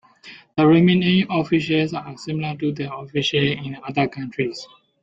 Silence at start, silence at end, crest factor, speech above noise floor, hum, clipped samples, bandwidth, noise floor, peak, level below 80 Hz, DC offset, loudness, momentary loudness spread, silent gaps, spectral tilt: 0.25 s; 0.35 s; 18 dB; 25 dB; none; under 0.1%; 7.8 kHz; -45 dBFS; -4 dBFS; -58 dBFS; under 0.1%; -21 LUFS; 14 LU; none; -6.5 dB/octave